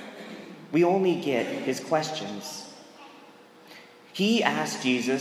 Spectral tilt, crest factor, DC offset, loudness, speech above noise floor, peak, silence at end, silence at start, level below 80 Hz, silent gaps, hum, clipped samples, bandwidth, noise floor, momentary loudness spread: -4.5 dB/octave; 24 dB; under 0.1%; -26 LUFS; 26 dB; -4 dBFS; 0 s; 0 s; -82 dBFS; none; none; under 0.1%; 15.5 kHz; -51 dBFS; 24 LU